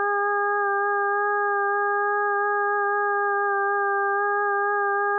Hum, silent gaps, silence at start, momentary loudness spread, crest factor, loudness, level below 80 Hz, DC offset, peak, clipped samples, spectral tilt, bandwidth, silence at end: none; none; 0 s; 0 LU; 10 dB; -23 LUFS; under -90 dBFS; under 0.1%; -14 dBFS; under 0.1%; 11 dB/octave; 1.8 kHz; 0 s